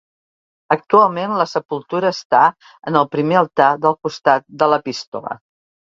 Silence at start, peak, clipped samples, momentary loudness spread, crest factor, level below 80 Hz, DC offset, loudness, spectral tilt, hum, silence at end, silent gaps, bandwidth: 0.7 s; 0 dBFS; under 0.1%; 13 LU; 18 dB; -64 dBFS; under 0.1%; -17 LUFS; -5.5 dB/octave; none; 0.6 s; 1.65-1.69 s, 2.25-2.30 s, 5.07-5.12 s; 7.8 kHz